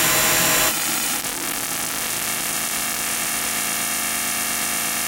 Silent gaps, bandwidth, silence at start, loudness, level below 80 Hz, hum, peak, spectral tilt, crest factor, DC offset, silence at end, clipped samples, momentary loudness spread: none; 17.5 kHz; 0 s; -20 LUFS; -50 dBFS; none; -4 dBFS; -0.5 dB/octave; 18 dB; under 0.1%; 0 s; under 0.1%; 7 LU